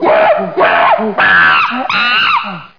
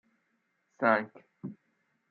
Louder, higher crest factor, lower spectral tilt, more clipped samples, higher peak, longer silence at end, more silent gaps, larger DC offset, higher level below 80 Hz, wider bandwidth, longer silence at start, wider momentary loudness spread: first, -9 LUFS vs -29 LUFS; second, 10 dB vs 26 dB; about the same, -5 dB/octave vs -4.5 dB/octave; neither; first, 0 dBFS vs -10 dBFS; second, 0.1 s vs 0.55 s; neither; first, 0.7% vs under 0.1%; first, -54 dBFS vs -88 dBFS; second, 5.4 kHz vs 6.8 kHz; second, 0 s vs 0.8 s; second, 5 LU vs 19 LU